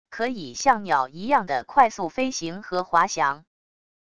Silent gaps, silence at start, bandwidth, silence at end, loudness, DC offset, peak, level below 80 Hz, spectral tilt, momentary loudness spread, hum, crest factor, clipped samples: none; 0.1 s; 11 kHz; 0.75 s; -23 LUFS; 0.4%; -4 dBFS; -60 dBFS; -3.5 dB/octave; 9 LU; none; 20 dB; under 0.1%